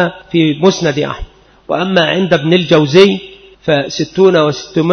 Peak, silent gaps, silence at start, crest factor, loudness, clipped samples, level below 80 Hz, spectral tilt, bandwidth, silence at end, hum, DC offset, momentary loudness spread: 0 dBFS; none; 0 s; 12 dB; -12 LUFS; 0.1%; -40 dBFS; -5.5 dB/octave; 6.6 kHz; 0 s; none; under 0.1%; 11 LU